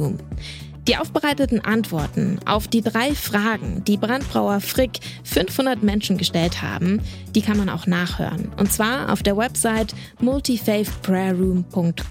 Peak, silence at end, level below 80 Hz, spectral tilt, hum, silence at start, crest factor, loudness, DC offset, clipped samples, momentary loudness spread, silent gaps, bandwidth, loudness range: -4 dBFS; 0 s; -36 dBFS; -5 dB/octave; none; 0 s; 16 dB; -21 LUFS; under 0.1%; under 0.1%; 5 LU; none; 17 kHz; 1 LU